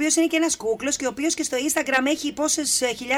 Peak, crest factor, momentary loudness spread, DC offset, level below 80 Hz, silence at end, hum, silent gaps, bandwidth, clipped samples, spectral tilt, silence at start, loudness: -4 dBFS; 18 dB; 4 LU; under 0.1%; -58 dBFS; 0 s; none; none; 16.5 kHz; under 0.1%; -1 dB/octave; 0 s; -22 LUFS